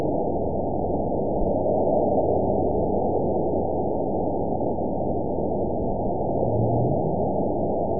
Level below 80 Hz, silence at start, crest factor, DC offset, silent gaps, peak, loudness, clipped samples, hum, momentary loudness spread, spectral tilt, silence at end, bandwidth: -40 dBFS; 0 s; 14 dB; 3%; none; -10 dBFS; -24 LUFS; under 0.1%; none; 4 LU; -18.5 dB/octave; 0 s; 1 kHz